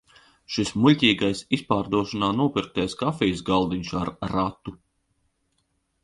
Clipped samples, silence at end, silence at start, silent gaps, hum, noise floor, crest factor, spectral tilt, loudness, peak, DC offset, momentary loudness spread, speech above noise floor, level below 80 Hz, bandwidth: under 0.1%; 1.3 s; 0.5 s; none; none; -72 dBFS; 20 dB; -5.5 dB/octave; -24 LUFS; -4 dBFS; under 0.1%; 10 LU; 48 dB; -50 dBFS; 11.5 kHz